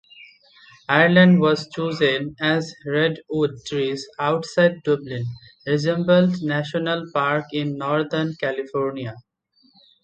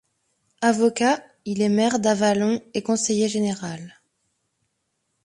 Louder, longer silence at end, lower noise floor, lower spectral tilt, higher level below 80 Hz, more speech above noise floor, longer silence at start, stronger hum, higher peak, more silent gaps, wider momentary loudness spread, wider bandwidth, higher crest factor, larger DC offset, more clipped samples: about the same, -21 LUFS vs -22 LUFS; second, 0.85 s vs 1.35 s; second, -61 dBFS vs -75 dBFS; first, -6.5 dB/octave vs -4.5 dB/octave; about the same, -62 dBFS vs -66 dBFS; second, 41 dB vs 53 dB; second, 0.2 s vs 0.6 s; neither; first, 0 dBFS vs -6 dBFS; neither; about the same, 11 LU vs 10 LU; second, 8.6 kHz vs 11.5 kHz; about the same, 20 dB vs 18 dB; neither; neither